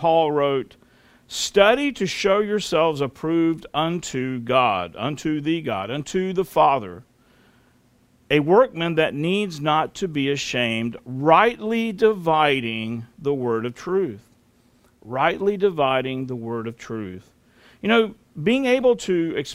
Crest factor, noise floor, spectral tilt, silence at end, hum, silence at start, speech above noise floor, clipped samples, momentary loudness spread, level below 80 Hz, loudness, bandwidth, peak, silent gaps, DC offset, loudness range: 20 dB; -59 dBFS; -5 dB/octave; 0 s; none; 0 s; 37 dB; under 0.1%; 11 LU; -56 dBFS; -21 LUFS; 16 kHz; -2 dBFS; none; under 0.1%; 4 LU